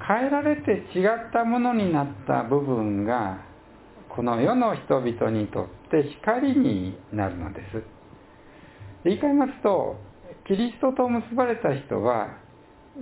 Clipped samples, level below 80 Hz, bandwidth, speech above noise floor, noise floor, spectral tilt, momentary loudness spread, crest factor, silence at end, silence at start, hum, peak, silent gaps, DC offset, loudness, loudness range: under 0.1%; -52 dBFS; 4 kHz; 27 dB; -51 dBFS; -11 dB/octave; 11 LU; 20 dB; 0 s; 0 s; none; -6 dBFS; none; under 0.1%; -25 LUFS; 3 LU